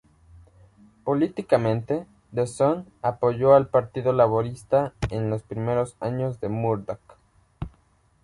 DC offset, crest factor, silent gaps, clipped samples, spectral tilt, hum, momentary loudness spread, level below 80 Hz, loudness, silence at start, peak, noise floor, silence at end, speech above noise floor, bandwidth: under 0.1%; 20 dB; none; under 0.1%; -8 dB/octave; none; 15 LU; -50 dBFS; -24 LUFS; 1.05 s; -4 dBFS; -62 dBFS; 0.55 s; 39 dB; 11.5 kHz